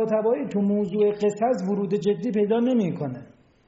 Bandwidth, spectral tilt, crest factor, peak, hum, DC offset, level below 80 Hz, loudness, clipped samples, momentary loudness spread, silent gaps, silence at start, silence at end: 8 kHz; -7.5 dB/octave; 12 dB; -12 dBFS; none; under 0.1%; -66 dBFS; -24 LUFS; under 0.1%; 6 LU; none; 0 s; 0.4 s